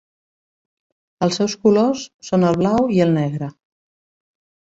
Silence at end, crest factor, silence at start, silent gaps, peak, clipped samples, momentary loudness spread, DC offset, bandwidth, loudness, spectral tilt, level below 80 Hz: 1.15 s; 16 dB; 1.2 s; 2.14-2.19 s; -4 dBFS; under 0.1%; 10 LU; under 0.1%; 8 kHz; -18 LUFS; -6.5 dB/octave; -54 dBFS